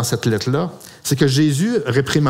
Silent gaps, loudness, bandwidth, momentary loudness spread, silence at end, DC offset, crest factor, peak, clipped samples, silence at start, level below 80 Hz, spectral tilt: none; -18 LUFS; 16 kHz; 8 LU; 0 s; under 0.1%; 18 dB; 0 dBFS; under 0.1%; 0 s; -50 dBFS; -5.5 dB/octave